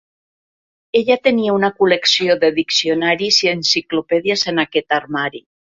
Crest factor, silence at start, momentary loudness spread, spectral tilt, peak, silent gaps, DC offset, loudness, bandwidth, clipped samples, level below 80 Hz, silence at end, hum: 16 dB; 0.95 s; 6 LU; -3 dB/octave; -2 dBFS; none; under 0.1%; -16 LUFS; 7.8 kHz; under 0.1%; -60 dBFS; 0.4 s; none